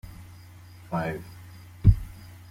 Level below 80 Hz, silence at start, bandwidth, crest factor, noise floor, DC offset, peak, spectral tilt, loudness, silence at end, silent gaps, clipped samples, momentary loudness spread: -34 dBFS; 0.05 s; 15.5 kHz; 24 dB; -47 dBFS; under 0.1%; -4 dBFS; -8.5 dB/octave; -27 LUFS; 0.25 s; none; under 0.1%; 26 LU